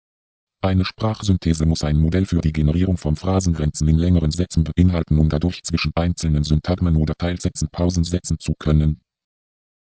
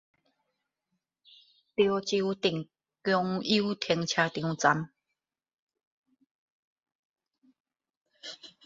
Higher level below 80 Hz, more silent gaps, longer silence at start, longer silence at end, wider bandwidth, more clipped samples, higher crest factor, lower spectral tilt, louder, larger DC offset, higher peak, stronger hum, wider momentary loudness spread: first, -26 dBFS vs -72 dBFS; second, none vs 5.54-5.67 s, 5.87-6.03 s, 6.31-6.76 s, 6.95-7.14 s, 7.60-7.65 s, 7.97-8.05 s; second, 0.65 s vs 1.8 s; first, 1 s vs 0.2 s; about the same, 8 kHz vs 7.8 kHz; neither; second, 16 dB vs 24 dB; first, -6.5 dB/octave vs -4.5 dB/octave; first, -20 LUFS vs -29 LUFS; neither; first, -2 dBFS vs -8 dBFS; neither; second, 5 LU vs 17 LU